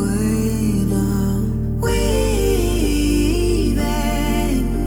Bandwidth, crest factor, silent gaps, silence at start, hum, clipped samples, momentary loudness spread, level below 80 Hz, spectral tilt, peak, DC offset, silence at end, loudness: 18 kHz; 12 dB; none; 0 s; none; under 0.1%; 2 LU; -22 dBFS; -6 dB/octave; -6 dBFS; under 0.1%; 0 s; -19 LUFS